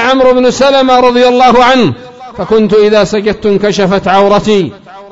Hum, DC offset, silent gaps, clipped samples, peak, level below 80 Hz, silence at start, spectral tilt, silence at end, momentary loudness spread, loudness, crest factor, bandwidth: none; under 0.1%; none; 0.6%; 0 dBFS; -36 dBFS; 0 s; -5 dB/octave; 0.05 s; 7 LU; -7 LUFS; 8 dB; 8 kHz